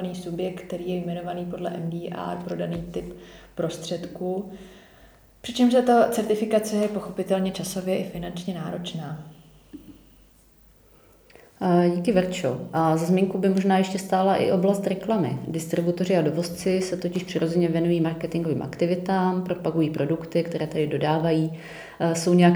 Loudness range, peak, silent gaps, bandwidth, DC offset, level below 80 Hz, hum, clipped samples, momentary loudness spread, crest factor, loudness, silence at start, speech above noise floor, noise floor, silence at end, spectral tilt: 9 LU; -6 dBFS; none; over 20 kHz; under 0.1%; -56 dBFS; none; under 0.1%; 12 LU; 18 dB; -25 LUFS; 0 s; 32 dB; -55 dBFS; 0 s; -6.5 dB/octave